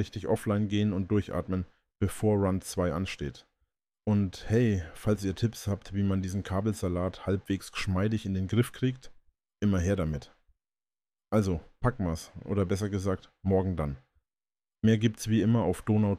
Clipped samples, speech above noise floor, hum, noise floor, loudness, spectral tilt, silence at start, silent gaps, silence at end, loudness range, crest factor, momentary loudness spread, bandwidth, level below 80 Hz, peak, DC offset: under 0.1%; over 61 dB; none; under -90 dBFS; -30 LUFS; -7 dB/octave; 0 s; none; 0 s; 2 LU; 16 dB; 8 LU; 15 kHz; -48 dBFS; -12 dBFS; under 0.1%